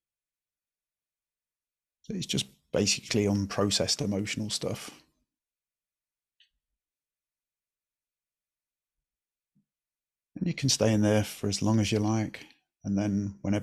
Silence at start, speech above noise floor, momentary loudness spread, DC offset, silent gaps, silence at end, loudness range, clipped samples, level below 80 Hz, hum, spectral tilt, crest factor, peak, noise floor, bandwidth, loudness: 2.1 s; over 62 dB; 12 LU; under 0.1%; none; 0 s; 11 LU; under 0.1%; -62 dBFS; none; -4.5 dB/octave; 22 dB; -10 dBFS; under -90 dBFS; 14.5 kHz; -28 LUFS